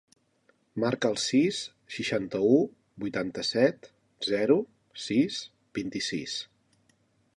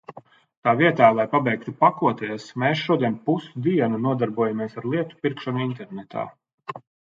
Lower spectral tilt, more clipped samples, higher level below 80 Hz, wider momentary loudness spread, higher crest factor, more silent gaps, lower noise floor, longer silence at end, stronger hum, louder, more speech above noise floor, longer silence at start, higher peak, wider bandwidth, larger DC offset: second, -4.5 dB/octave vs -7.5 dB/octave; neither; about the same, -68 dBFS vs -68 dBFS; about the same, 14 LU vs 16 LU; about the same, 20 dB vs 22 dB; second, none vs 0.57-0.63 s, 6.54-6.58 s; first, -68 dBFS vs -45 dBFS; first, 0.95 s vs 0.35 s; neither; second, -28 LUFS vs -23 LUFS; first, 41 dB vs 23 dB; first, 0.75 s vs 0.1 s; second, -10 dBFS vs -2 dBFS; first, 11.5 kHz vs 7.6 kHz; neither